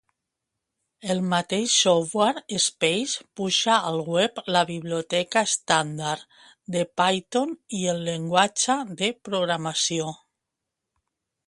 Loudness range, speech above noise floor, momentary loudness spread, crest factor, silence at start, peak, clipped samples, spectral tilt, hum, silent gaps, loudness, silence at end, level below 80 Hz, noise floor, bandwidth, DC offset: 3 LU; 60 dB; 9 LU; 22 dB; 1.05 s; -4 dBFS; under 0.1%; -3 dB/octave; none; none; -24 LUFS; 1.35 s; -68 dBFS; -84 dBFS; 11.5 kHz; under 0.1%